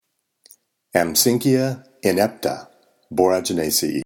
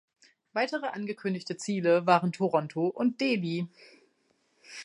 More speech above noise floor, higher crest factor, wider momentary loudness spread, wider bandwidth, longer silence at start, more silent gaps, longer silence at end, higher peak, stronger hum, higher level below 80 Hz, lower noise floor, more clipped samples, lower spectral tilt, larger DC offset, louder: about the same, 40 dB vs 43 dB; about the same, 20 dB vs 22 dB; about the same, 10 LU vs 10 LU; first, 18 kHz vs 11 kHz; first, 0.95 s vs 0.55 s; neither; about the same, 0 s vs 0 s; first, 0 dBFS vs -8 dBFS; neither; first, -56 dBFS vs -82 dBFS; second, -59 dBFS vs -71 dBFS; neither; second, -4 dB/octave vs -6 dB/octave; neither; first, -20 LUFS vs -29 LUFS